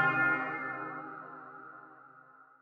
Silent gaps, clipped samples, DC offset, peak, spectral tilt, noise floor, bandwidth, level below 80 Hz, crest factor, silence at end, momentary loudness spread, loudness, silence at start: none; under 0.1%; under 0.1%; -16 dBFS; -7.5 dB/octave; -58 dBFS; 6.6 kHz; -84 dBFS; 20 dB; 0.2 s; 24 LU; -33 LUFS; 0 s